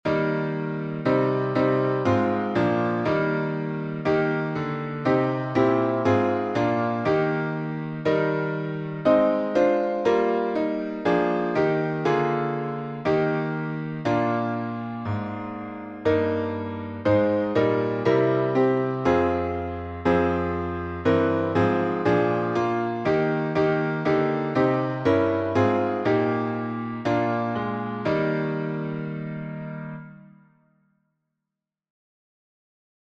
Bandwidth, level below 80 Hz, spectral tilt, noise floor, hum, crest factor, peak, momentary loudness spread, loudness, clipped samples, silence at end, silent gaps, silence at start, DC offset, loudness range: 7.6 kHz; -54 dBFS; -8 dB/octave; -86 dBFS; none; 16 dB; -8 dBFS; 8 LU; -24 LUFS; under 0.1%; 2.75 s; none; 0.05 s; under 0.1%; 4 LU